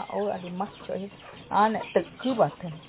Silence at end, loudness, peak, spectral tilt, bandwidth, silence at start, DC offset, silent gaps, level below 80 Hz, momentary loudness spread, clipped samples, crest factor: 0 s; -28 LUFS; -10 dBFS; -4.5 dB/octave; 4 kHz; 0 s; under 0.1%; none; -62 dBFS; 12 LU; under 0.1%; 18 dB